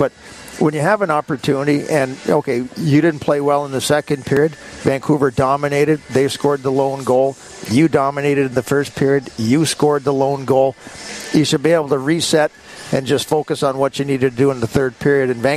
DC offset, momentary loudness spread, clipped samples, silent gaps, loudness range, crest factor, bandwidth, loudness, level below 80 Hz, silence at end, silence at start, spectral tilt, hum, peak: under 0.1%; 5 LU; under 0.1%; none; 1 LU; 14 dB; 14 kHz; -17 LUFS; -50 dBFS; 0 s; 0 s; -5.5 dB/octave; none; -2 dBFS